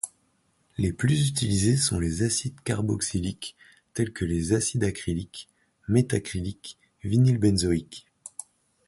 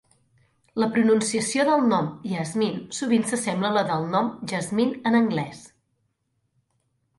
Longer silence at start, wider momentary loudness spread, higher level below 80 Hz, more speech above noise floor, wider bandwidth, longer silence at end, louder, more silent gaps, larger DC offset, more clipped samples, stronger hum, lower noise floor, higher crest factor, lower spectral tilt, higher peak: second, 0.05 s vs 0.75 s; first, 18 LU vs 9 LU; first, -44 dBFS vs -68 dBFS; second, 43 dB vs 50 dB; about the same, 11.5 kHz vs 11.5 kHz; second, 0.6 s vs 1.5 s; second, -26 LUFS vs -23 LUFS; neither; neither; neither; neither; second, -68 dBFS vs -73 dBFS; about the same, 18 dB vs 16 dB; about the same, -5 dB/octave vs -5 dB/octave; about the same, -8 dBFS vs -8 dBFS